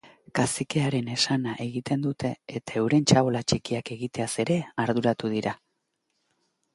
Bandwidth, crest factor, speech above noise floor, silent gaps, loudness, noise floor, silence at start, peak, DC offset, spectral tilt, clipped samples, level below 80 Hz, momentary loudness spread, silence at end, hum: 11.5 kHz; 22 dB; 51 dB; none; -26 LUFS; -77 dBFS; 0.05 s; -4 dBFS; under 0.1%; -5 dB/octave; under 0.1%; -58 dBFS; 10 LU; 1.2 s; none